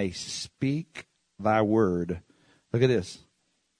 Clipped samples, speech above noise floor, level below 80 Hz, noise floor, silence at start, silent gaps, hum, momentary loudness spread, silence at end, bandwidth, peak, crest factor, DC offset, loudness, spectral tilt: under 0.1%; 47 dB; -58 dBFS; -74 dBFS; 0 s; none; none; 19 LU; 0.65 s; 10.5 kHz; -8 dBFS; 20 dB; under 0.1%; -27 LUFS; -6 dB/octave